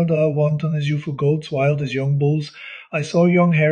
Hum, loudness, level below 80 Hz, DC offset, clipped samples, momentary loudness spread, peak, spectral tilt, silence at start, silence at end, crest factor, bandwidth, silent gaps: none; -19 LUFS; -60 dBFS; under 0.1%; under 0.1%; 10 LU; -4 dBFS; -8 dB/octave; 0 s; 0 s; 14 dB; 9.2 kHz; none